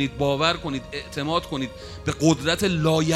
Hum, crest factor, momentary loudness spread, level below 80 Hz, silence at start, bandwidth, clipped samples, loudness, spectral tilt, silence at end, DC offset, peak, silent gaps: none; 18 dB; 10 LU; -44 dBFS; 0 s; 15 kHz; under 0.1%; -24 LUFS; -5 dB/octave; 0 s; under 0.1%; -4 dBFS; none